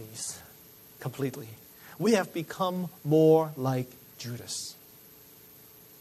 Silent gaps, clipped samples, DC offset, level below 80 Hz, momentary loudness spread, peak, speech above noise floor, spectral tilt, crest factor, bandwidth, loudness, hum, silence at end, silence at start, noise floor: none; under 0.1%; under 0.1%; -72 dBFS; 27 LU; -10 dBFS; 25 dB; -5.5 dB/octave; 20 dB; 13.5 kHz; -29 LUFS; none; 1.3 s; 0 s; -53 dBFS